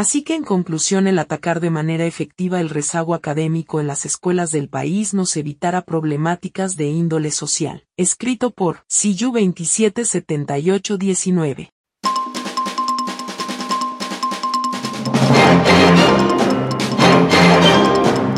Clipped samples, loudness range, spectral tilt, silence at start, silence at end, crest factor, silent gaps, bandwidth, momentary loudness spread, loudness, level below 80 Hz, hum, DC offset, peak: under 0.1%; 8 LU; -4.5 dB/octave; 0 s; 0 s; 16 dB; 11.72-11.84 s; 13 kHz; 12 LU; -17 LUFS; -52 dBFS; none; under 0.1%; 0 dBFS